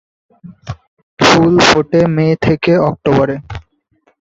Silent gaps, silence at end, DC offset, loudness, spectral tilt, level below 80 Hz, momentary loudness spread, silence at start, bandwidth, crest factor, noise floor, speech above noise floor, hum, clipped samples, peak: 0.88-0.97 s, 1.03-1.17 s; 0.7 s; under 0.1%; -11 LUFS; -5.5 dB/octave; -40 dBFS; 22 LU; 0.45 s; 8 kHz; 14 dB; -58 dBFS; 46 dB; none; under 0.1%; 0 dBFS